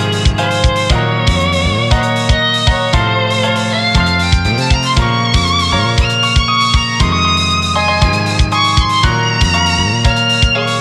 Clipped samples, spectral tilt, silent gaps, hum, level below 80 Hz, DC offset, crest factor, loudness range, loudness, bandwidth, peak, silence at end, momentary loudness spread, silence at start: under 0.1%; -4.5 dB/octave; none; none; -20 dBFS; under 0.1%; 12 dB; 1 LU; -12 LUFS; 12.5 kHz; 0 dBFS; 0 s; 2 LU; 0 s